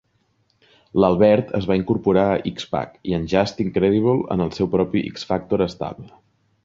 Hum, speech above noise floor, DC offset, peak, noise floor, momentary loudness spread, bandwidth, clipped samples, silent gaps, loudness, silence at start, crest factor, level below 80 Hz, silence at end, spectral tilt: none; 45 dB; under 0.1%; -2 dBFS; -65 dBFS; 10 LU; 7.6 kHz; under 0.1%; none; -20 LUFS; 0.95 s; 18 dB; -46 dBFS; 0.6 s; -7.5 dB/octave